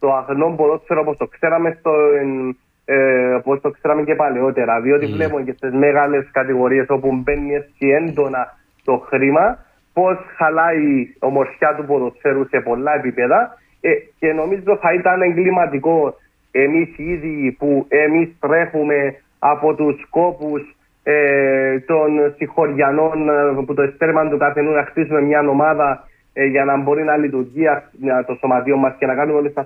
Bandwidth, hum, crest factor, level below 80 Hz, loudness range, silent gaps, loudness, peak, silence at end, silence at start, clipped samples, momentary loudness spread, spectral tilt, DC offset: 3.9 kHz; none; 14 dB; -48 dBFS; 2 LU; none; -17 LUFS; -2 dBFS; 0 s; 0 s; under 0.1%; 6 LU; -10.5 dB/octave; under 0.1%